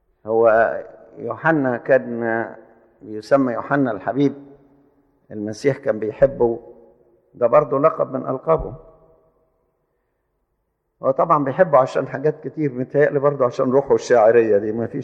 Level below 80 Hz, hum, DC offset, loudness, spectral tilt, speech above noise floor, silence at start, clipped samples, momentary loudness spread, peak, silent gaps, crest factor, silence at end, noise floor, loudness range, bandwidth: -50 dBFS; none; under 0.1%; -19 LUFS; -7.5 dB/octave; 53 dB; 0.25 s; under 0.1%; 14 LU; -2 dBFS; none; 18 dB; 0 s; -72 dBFS; 6 LU; 8.4 kHz